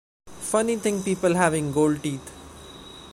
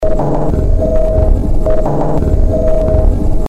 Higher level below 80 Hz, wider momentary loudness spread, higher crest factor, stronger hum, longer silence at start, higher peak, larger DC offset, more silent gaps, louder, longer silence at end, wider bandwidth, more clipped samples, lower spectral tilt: second, -52 dBFS vs -12 dBFS; first, 21 LU vs 2 LU; first, 22 dB vs 10 dB; neither; first, 0.25 s vs 0 s; second, -4 dBFS vs 0 dBFS; neither; neither; second, -24 LUFS vs -14 LUFS; about the same, 0 s vs 0 s; first, 16 kHz vs 8 kHz; neither; second, -5 dB/octave vs -9.5 dB/octave